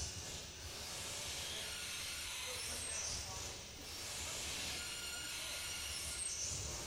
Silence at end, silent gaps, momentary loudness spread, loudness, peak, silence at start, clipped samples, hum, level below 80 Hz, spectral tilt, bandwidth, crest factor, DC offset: 0 s; none; 6 LU; -42 LUFS; -30 dBFS; 0 s; under 0.1%; none; -58 dBFS; -1 dB/octave; 17.5 kHz; 14 dB; under 0.1%